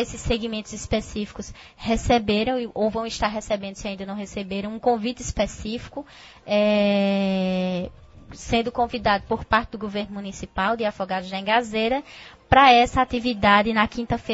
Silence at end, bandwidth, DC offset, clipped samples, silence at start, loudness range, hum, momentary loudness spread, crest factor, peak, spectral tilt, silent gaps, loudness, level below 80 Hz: 0 s; 8 kHz; under 0.1%; under 0.1%; 0 s; 7 LU; none; 15 LU; 20 dB; -2 dBFS; -5 dB/octave; none; -23 LUFS; -42 dBFS